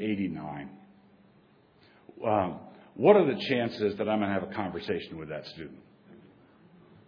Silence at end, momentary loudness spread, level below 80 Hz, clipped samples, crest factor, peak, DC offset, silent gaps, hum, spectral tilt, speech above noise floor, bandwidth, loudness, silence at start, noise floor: 0.9 s; 22 LU; -66 dBFS; under 0.1%; 24 dB; -6 dBFS; under 0.1%; none; none; -8 dB/octave; 33 dB; 5.4 kHz; -29 LUFS; 0 s; -61 dBFS